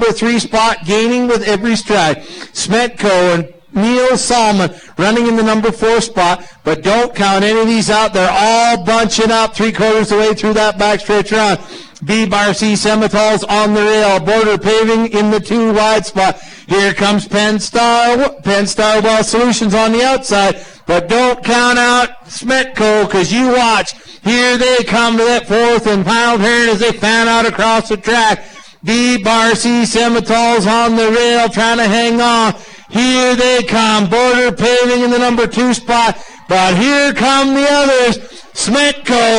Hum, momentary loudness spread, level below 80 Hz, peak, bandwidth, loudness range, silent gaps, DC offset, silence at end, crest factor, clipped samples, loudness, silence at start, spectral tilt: none; 5 LU; -40 dBFS; 0 dBFS; 10.5 kHz; 2 LU; none; under 0.1%; 0 s; 12 dB; under 0.1%; -11 LUFS; 0 s; -3.5 dB/octave